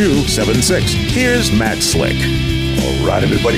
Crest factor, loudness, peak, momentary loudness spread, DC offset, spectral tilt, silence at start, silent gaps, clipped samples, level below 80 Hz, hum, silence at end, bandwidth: 10 dB; -14 LUFS; -4 dBFS; 3 LU; under 0.1%; -4.5 dB/octave; 0 s; none; under 0.1%; -24 dBFS; none; 0 s; 16 kHz